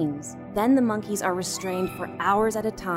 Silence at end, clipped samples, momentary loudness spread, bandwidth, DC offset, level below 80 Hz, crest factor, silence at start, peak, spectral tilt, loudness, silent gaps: 0 s; under 0.1%; 9 LU; 16 kHz; under 0.1%; -54 dBFS; 14 dB; 0 s; -10 dBFS; -5 dB/octave; -25 LUFS; none